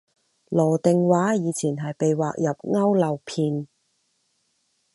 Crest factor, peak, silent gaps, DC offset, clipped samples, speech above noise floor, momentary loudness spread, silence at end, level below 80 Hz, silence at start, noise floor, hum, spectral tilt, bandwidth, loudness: 18 dB; -6 dBFS; none; under 0.1%; under 0.1%; 49 dB; 7 LU; 1.3 s; -70 dBFS; 0.5 s; -70 dBFS; none; -7 dB/octave; 11.5 kHz; -23 LUFS